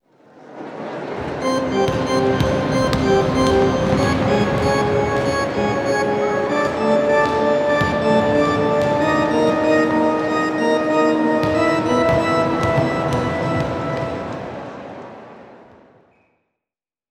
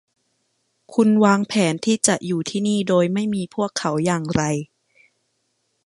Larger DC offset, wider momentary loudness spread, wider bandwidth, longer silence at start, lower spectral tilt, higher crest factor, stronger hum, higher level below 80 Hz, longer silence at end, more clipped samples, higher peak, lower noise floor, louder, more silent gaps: neither; first, 11 LU vs 8 LU; first, 14 kHz vs 11.5 kHz; second, 0.4 s vs 0.9 s; about the same, -6 dB/octave vs -5 dB/octave; about the same, 18 dB vs 20 dB; neither; first, -40 dBFS vs -56 dBFS; first, 1.55 s vs 1.2 s; neither; about the same, -2 dBFS vs -2 dBFS; first, -89 dBFS vs -71 dBFS; about the same, -18 LUFS vs -20 LUFS; neither